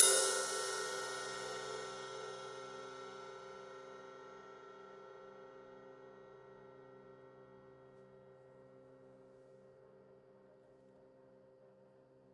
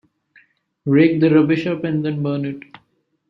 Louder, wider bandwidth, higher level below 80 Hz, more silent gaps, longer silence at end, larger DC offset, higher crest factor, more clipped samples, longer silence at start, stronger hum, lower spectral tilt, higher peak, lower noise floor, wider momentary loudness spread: second, -39 LUFS vs -18 LUFS; first, 11.5 kHz vs 5.8 kHz; second, -86 dBFS vs -62 dBFS; neither; second, 0.15 s vs 0.7 s; neither; first, 32 dB vs 16 dB; neither; second, 0 s vs 0.85 s; neither; second, 0 dB/octave vs -9.5 dB/octave; second, -10 dBFS vs -2 dBFS; about the same, -65 dBFS vs -65 dBFS; first, 23 LU vs 15 LU